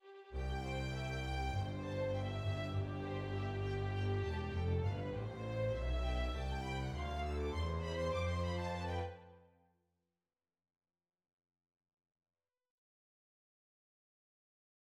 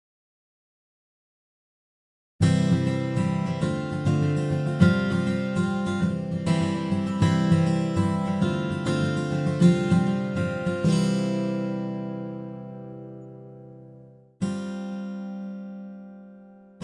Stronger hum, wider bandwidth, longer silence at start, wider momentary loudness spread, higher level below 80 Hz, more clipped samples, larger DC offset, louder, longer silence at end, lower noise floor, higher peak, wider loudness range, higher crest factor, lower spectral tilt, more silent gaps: neither; about the same, 11 kHz vs 11.5 kHz; second, 0.05 s vs 2.4 s; second, 4 LU vs 18 LU; first, -48 dBFS vs -56 dBFS; neither; neither; second, -40 LUFS vs -25 LUFS; first, 5.45 s vs 0 s; first, under -90 dBFS vs -50 dBFS; second, -28 dBFS vs -4 dBFS; second, 5 LU vs 12 LU; second, 14 dB vs 20 dB; about the same, -6.5 dB/octave vs -7.5 dB/octave; neither